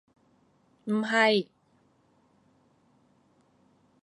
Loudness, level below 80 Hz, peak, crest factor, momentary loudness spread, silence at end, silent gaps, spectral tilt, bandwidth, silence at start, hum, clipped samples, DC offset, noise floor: -25 LUFS; -82 dBFS; -10 dBFS; 22 dB; 21 LU; 2.6 s; none; -4.5 dB/octave; 11 kHz; 0.85 s; none; under 0.1%; under 0.1%; -67 dBFS